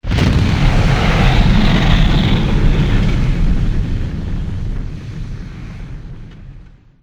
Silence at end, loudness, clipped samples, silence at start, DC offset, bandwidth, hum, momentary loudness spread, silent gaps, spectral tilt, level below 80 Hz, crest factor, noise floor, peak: 0.35 s; -15 LUFS; under 0.1%; 0.05 s; under 0.1%; 8.8 kHz; none; 18 LU; none; -6.5 dB/octave; -16 dBFS; 14 dB; -39 dBFS; 0 dBFS